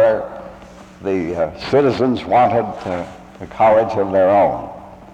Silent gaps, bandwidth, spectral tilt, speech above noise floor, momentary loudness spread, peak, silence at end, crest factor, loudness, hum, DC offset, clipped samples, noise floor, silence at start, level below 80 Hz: none; 8.8 kHz; -7.5 dB/octave; 23 dB; 20 LU; -4 dBFS; 0.1 s; 12 dB; -17 LUFS; none; under 0.1%; under 0.1%; -39 dBFS; 0 s; -48 dBFS